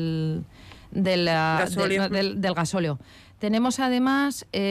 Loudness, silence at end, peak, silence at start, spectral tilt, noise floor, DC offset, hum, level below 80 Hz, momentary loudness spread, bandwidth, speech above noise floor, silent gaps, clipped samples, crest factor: -24 LUFS; 0 s; -14 dBFS; 0 s; -5 dB/octave; -45 dBFS; under 0.1%; none; -56 dBFS; 10 LU; 15 kHz; 21 dB; none; under 0.1%; 10 dB